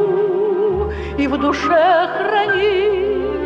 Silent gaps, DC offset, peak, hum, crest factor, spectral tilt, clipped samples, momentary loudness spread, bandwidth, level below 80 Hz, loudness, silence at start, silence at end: none; under 0.1%; -4 dBFS; none; 12 dB; -6 dB/octave; under 0.1%; 6 LU; 7.4 kHz; -36 dBFS; -17 LUFS; 0 s; 0 s